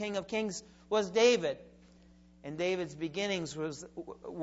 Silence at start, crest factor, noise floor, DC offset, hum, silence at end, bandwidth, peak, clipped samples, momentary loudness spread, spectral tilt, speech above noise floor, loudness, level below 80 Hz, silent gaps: 0 s; 20 dB; -60 dBFS; under 0.1%; none; 0 s; 8 kHz; -14 dBFS; under 0.1%; 19 LU; -4 dB/octave; 26 dB; -32 LUFS; -66 dBFS; none